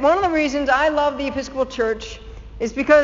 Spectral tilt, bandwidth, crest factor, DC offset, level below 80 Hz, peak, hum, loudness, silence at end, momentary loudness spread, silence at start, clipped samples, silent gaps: -2.5 dB/octave; 7.6 kHz; 18 dB; under 0.1%; -40 dBFS; -2 dBFS; none; -20 LUFS; 0 s; 14 LU; 0 s; under 0.1%; none